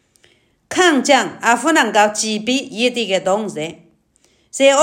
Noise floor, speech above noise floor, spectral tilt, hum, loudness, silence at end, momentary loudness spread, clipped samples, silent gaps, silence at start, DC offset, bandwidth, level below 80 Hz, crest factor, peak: -58 dBFS; 42 dB; -2.5 dB/octave; none; -16 LUFS; 0 s; 11 LU; under 0.1%; none; 0.7 s; under 0.1%; 16.5 kHz; -66 dBFS; 16 dB; 0 dBFS